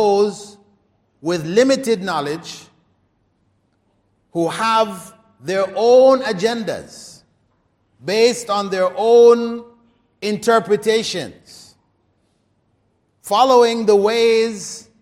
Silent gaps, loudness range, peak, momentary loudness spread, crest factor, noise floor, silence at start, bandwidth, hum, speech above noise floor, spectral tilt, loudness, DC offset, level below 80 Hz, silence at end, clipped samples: none; 6 LU; -2 dBFS; 20 LU; 16 dB; -64 dBFS; 0 s; 15 kHz; none; 48 dB; -4 dB/octave; -16 LUFS; under 0.1%; -64 dBFS; 0.2 s; under 0.1%